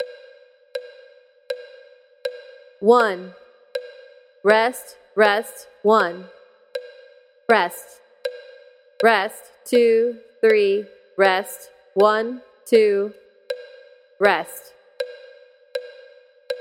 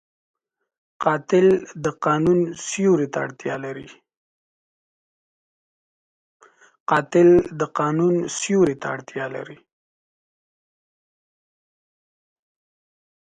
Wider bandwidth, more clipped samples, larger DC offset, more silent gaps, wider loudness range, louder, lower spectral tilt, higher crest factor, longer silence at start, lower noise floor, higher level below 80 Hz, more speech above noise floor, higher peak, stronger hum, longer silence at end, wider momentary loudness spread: first, 16.5 kHz vs 9.4 kHz; neither; neither; second, none vs 4.17-6.40 s, 6.80-6.86 s; second, 5 LU vs 15 LU; about the same, -19 LUFS vs -20 LUFS; second, -4 dB/octave vs -6 dB/octave; about the same, 22 dB vs 20 dB; second, 0 s vs 1 s; second, -51 dBFS vs under -90 dBFS; second, -74 dBFS vs -58 dBFS; second, 33 dB vs over 70 dB; about the same, -2 dBFS vs -4 dBFS; neither; second, 0 s vs 3.75 s; first, 19 LU vs 14 LU